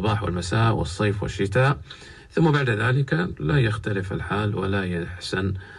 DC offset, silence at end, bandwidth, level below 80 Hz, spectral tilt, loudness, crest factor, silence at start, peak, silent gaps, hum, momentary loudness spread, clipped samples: under 0.1%; 0 s; 11.5 kHz; -42 dBFS; -6.5 dB/octave; -24 LUFS; 16 dB; 0 s; -8 dBFS; none; none; 8 LU; under 0.1%